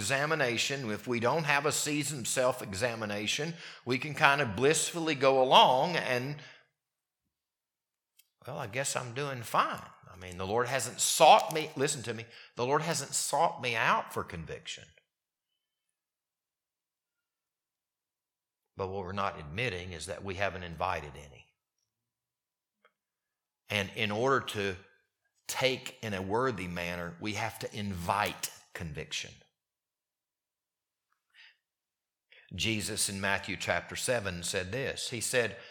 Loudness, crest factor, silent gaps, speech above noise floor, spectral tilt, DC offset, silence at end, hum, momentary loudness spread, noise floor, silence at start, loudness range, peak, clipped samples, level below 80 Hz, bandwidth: -30 LUFS; 28 dB; none; over 59 dB; -3 dB/octave; under 0.1%; 0 s; none; 15 LU; under -90 dBFS; 0 s; 13 LU; -4 dBFS; under 0.1%; -64 dBFS; 19 kHz